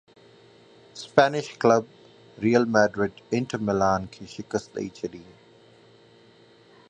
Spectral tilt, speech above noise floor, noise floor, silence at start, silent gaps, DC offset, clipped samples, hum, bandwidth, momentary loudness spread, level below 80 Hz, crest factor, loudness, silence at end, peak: -5.5 dB/octave; 31 dB; -55 dBFS; 0.95 s; none; under 0.1%; under 0.1%; none; 9.4 kHz; 18 LU; -58 dBFS; 26 dB; -24 LUFS; 1.7 s; 0 dBFS